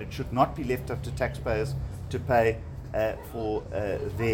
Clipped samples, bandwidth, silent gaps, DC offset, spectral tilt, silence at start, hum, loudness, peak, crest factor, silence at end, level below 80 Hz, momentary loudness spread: under 0.1%; 17 kHz; none; under 0.1%; -7 dB/octave; 0 s; none; -29 LUFS; -10 dBFS; 18 dB; 0 s; -42 dBFS; 10 LU